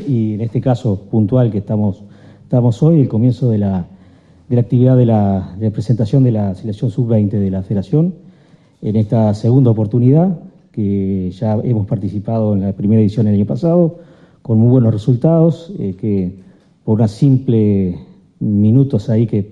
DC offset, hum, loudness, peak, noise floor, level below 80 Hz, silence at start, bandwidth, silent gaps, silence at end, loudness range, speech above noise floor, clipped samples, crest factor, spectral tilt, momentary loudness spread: under 0.1%; none; -15 LUFS; 0 dBFS; -48 dBFS; -48 dBFS; 0 s; 7.4 kHz; none; 0 s; 2 LU; 34 dB; under 0.1%; 14 dB; -10.5 dB/octave; 9 LU